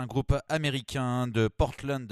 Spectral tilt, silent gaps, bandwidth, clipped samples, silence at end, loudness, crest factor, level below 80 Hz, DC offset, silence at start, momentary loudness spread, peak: -6 dB/octave; none; 13.5 kHz; under 0.1%; 0 s; -29 LUFS; 18 dB; -40 dBFS; under 0.1%; 0 s; 3 LU; -12 dBFS